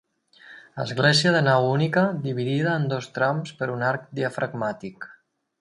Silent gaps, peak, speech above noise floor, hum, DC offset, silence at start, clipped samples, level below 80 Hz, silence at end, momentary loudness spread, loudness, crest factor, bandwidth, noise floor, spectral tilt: none; -6 dBFS; 28 dB; none; under 0.1%; 0.45 s; under 0.1%; -66 dBFS; 0.5 s; 15 LU; -23 LUFS; 18 dB; 11.5 kHz; -51 dBFS; -5.5 dB/octave